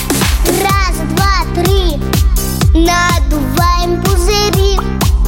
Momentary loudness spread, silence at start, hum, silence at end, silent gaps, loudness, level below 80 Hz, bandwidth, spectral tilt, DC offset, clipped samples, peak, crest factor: 4 LU; 0 s; none; 0 s; none; -12 LUFS; -14 dBFS; 17 kHz; -4.5 dB/octave; under 0.1%; under 0.1%; 0 dBFS; 10 dB